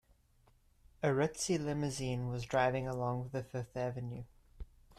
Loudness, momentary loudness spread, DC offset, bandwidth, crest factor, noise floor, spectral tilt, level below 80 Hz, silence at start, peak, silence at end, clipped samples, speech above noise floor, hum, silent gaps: -36 LUFS; 17 LU; under 0.1%; 13.5 kHz; 18 dB; -69 dBFS; -5.5 dB/octave; -58 dBFS; 1 s; -20 dBFS; 0.05 s; under 0.1%; 33 dB; none; none